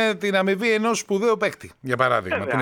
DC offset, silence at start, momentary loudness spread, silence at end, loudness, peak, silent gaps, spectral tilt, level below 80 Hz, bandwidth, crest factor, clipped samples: under 0.1%; 0 s; 6 LU; 0 s; -22 LUFS; -4 dBFS; none; -4.5 dB/octave; -62 dBFS; 18 kHz; 18 dB; under 0.1%